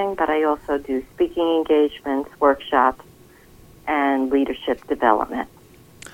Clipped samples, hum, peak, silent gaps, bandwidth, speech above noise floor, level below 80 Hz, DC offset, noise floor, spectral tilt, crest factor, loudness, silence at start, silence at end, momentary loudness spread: under 0.1%; none; -2 dBFS; none; 17 kHz; 28 dB; -50 dBFS; under 0.1%; -48 dBFS; -5 dB/octave; 20 dB; -21 LUFS; 0 s; 0.05 s; 9 LU